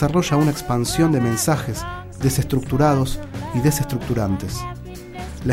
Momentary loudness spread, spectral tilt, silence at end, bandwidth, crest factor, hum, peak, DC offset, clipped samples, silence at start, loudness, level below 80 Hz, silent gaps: 14 LU; -5.5 dB/octave; 0 s; 16.5 kHz; 16 dB; none; -4 dBFS; under 0.1%; under 0.1%; 0 s; -21 LUFS; -36 dBFS; none